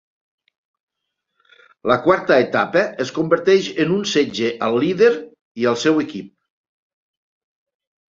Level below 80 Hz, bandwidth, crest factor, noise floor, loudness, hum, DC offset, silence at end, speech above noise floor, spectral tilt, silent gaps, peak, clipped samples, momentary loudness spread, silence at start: -62 dBFS; 7.8 kHz; 18 dB; -78 dBFS; -18 LUFS; none; under 0.1%; 1.85 s; 61 dB; -5 dB/octave; 5.41-5.55 s; -2 dBFS; under 0.1%; 9 LU; 1.85 s